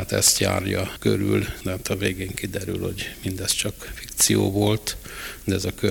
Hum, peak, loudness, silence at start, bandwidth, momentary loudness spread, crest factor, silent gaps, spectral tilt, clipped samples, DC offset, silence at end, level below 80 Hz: none; -4 dBFS; -23 LUFS; 0 s; over 20 kHz; 12 LU; 20 dB; none; -3.5 dB/octave; under 0.1%; under 0.1%; 0 s; -44 dBFS